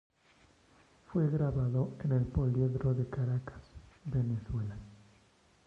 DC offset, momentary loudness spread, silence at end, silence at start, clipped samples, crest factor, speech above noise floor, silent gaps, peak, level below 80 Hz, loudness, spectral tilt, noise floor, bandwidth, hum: under 0.1%; 13 LU; 0.7 s; 1.1 s; under 0.1%; 16 dB; 34 dB; none; -18 dBFS; -50 dBFS; -33 LUFS; -10.5 dB/octave; -66 dBFS; 5.4 kHz; none